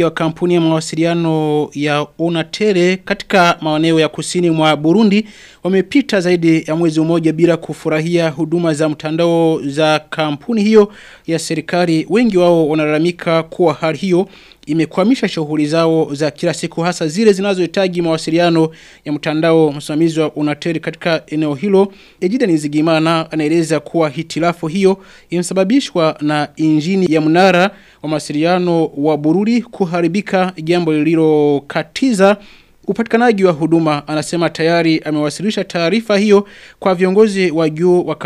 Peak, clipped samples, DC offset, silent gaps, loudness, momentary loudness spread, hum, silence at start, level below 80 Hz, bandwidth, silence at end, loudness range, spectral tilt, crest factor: 0 dBFS; under 0.1%; under 0.1%; none; -14 LUFS; 7 LU; none; 0 s; -54 dBFS; 12.5 kHz; 0 s; 2 LU; -6 dB/octave; 14 dB